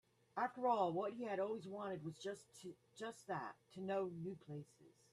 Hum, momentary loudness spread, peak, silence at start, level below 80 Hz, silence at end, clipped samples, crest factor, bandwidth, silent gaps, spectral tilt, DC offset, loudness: none; 15 LU; -24 dBFS; 0.35 s; -86 dBFS; 0.2 s; under 0.1%; 20 dB; 13 kHz; none; -6 dB/octave; under 0.1%; -45 LUFS